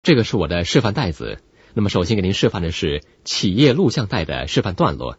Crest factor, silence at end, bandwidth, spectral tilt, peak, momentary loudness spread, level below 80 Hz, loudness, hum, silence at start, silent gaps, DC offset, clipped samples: 18 dB; 0.05 s; 8 kHz; -5.5 dB/octave; 0 dBFS; 10 LU; -38 dBFS; -19 LUFS; none; 0.05 s; none; under 0.1%; under 0.1%